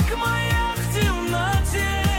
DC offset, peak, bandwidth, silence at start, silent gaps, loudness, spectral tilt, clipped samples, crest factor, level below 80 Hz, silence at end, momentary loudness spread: under 0.1%; -10 dBFS; 17 kHz; 0 s; none; -22 LUFS; -4.5 dB/octave; under 0.1%; 10 dB; -28 dBFS; 0 s; 1 LU